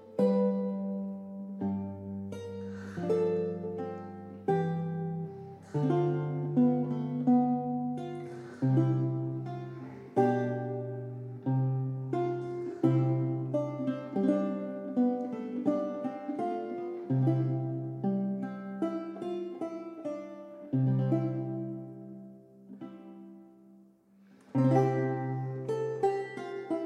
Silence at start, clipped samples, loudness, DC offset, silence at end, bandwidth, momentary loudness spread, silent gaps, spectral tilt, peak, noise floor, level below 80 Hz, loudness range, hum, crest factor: 0 s; under 0.1%; -32 LUFS; under 0.1%; 0 s; 6.8 kHz; 14 LU; none; -10 dB/octave; -14 dBFS; -60 dBFS; -80 dBFS; 5 LU; none; 18 dB